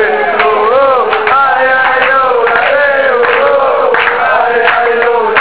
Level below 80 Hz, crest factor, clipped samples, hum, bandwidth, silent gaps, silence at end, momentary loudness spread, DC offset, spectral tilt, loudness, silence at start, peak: -46 dBFS; 8 dB; 0.5%; none; 4 kHz; none; 0 s; 2 LU; 1%; -6 dB/octave; -8 LUFS; 0 s; 0 dBFS